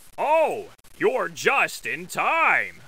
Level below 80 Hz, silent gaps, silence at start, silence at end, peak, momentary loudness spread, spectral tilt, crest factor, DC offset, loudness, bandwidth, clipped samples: -62 dBFS; none; 0.2 s; 0.15 s; -6 dBFS; 8 LU; -3 dB/octave; 18 dB; 0.4%; -22 LUFS; 16 kHz; under 0.1%